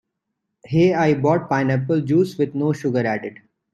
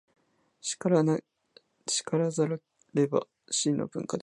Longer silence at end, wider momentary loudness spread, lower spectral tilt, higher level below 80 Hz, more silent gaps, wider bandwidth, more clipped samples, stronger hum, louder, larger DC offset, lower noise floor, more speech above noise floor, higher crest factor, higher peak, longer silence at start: first, 0.4 s vs 0 s; second, 7 LU vs 10 LU; first, -8 dB/octave vs -5 dB/octave; first, -58 dBFS vs -74 dBFS; neither; about the same, 12.5 kHz vs 11.5 kHz; neither; neither; first, -20 LUFS vs -29 LUFS; neither; first, -78 dBFS vs -62 dBFS; first, 59 dB vs 34 dB; about the same, 16 dB vs 20 dB; first, -4 dBFS vs -10 dBFS; about the same, 0.7 s vs 0.65 s